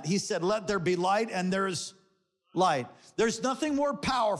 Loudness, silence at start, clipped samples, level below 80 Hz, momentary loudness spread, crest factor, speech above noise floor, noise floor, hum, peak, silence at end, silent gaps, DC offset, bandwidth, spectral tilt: -29 LUFS; 0 s; under 0.1%; -62 dBFS; 7 LU; 14 dB; 43 dB; -72 dBFS; none; -16 dBFS; 0 s; none; under 0.1%; 12.5 kHz; -4.5 dB/octave